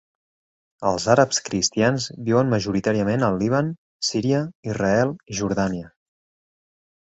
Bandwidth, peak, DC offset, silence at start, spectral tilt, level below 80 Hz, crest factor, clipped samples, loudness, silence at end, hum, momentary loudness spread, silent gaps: 8.2 kHz; -2 dBFS; under 0.1%; 0.8 s; -5 dB/octave; -52 dBFS; 20 dB; under 0.1%; -22 LUFS; 1.15 s; none; 8 LU; 3.78-4.00 s, 4.55-4.63 s